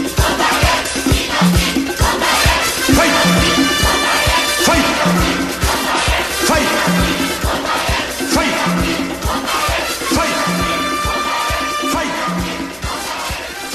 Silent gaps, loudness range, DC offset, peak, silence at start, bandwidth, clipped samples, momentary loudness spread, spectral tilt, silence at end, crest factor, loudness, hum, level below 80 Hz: none; 4 LU; under 0.1%; -2 dBFS; 0 s; 13.5 kHz; under 0.1%; 7 LU; -3.5 dB/octave; 0 s; 14 dB; -15 LUFS; none; -26 dBFS